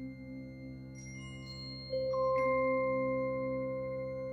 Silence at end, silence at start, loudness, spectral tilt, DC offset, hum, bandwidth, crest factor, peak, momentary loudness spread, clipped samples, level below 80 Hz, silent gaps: 0 s; 0 s; -35 LUFS; -6.5 dB/octave; under 0.1%; none; 8 kHz; 14 dB; -22 dBFS; 16 LU; under 0.1%; -60 dBFS; none